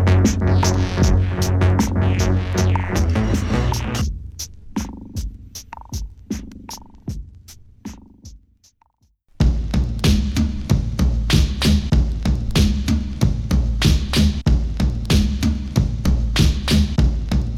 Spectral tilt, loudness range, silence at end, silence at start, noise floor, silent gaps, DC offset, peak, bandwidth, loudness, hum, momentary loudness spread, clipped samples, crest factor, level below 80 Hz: -5.5 dB/octave; 14 LU; 0 s; 0 s; -61 dBFS; none; under 0.1%; -2 dBFS; 15 kHz; -19 LUFS; none; 16 LU; under 0.1%; 16 dB; -22 dBFS